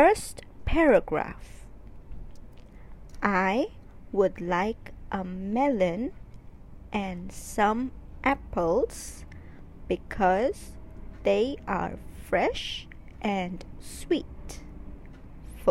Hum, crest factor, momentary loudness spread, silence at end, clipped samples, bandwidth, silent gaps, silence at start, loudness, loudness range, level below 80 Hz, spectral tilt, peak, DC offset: none; 22 dB; 23 LU; 0 s; under 0.1%; 16 kHz; none; 0 s; -28 LUFS; 4 LU; -44 dBFS; -5.5 dB/octave; -8 dBFS; under 0.1%